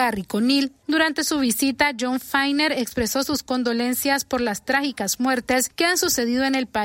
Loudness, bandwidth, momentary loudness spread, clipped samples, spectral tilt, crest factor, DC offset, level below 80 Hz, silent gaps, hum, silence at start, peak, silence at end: -21 LUFS; 16.5 kHz; 4 LU; under 0.1%; -2.5 dB/octave; 18 dB; under 0.1%; -52 dBFS; none; none; 0 s; -4 dBFS; 0 s